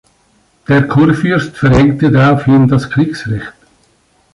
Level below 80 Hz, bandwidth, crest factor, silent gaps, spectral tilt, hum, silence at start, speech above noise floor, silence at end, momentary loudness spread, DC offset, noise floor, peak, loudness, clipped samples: -34 dBFS; 11.5 kHz; 12 dB; none; -8 dB/octave; none; 0.7 s; 43 dB; 0.85 s; 12 LU; under 0.1%; -54 dBFS; 0 dBFS; -11 LUFS; under 0.1%